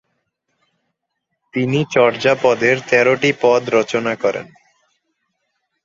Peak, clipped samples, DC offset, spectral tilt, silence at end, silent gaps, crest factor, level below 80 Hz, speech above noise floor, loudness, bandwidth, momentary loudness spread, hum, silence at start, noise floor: 0 dBFS; under 0.1%; under 0.1%; -5 dB/octave; 1.4 s; none; 18 dB; -60 dBFS; 60 dB; -16 LUFS; 7.6 kHz; 7 LU; none; 1.55 s; -75 dBFS